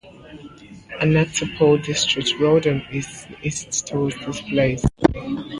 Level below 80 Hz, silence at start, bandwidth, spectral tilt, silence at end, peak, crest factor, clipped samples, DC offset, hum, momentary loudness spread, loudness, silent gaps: -40 dBFS; 0.05 s; 11.5 kHz; -4.5 dB/octave; 0 s; 0 dBFS; 20 dB; under 0.1%; under 0.1%; none; 13 LU; -20 LUFS; none